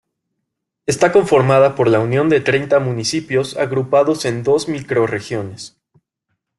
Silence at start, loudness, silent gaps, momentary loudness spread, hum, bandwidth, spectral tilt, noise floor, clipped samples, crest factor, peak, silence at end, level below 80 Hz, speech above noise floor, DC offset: 0.9 s; -16 LUFS; none; 12 LU; none; 12 kHz; -5.5 dB/octave; -76 dBFS; under 0.1%; 16 dB; -2 dBFS; 0.9 s; -54 dBFS; 61 dB; under 0.1%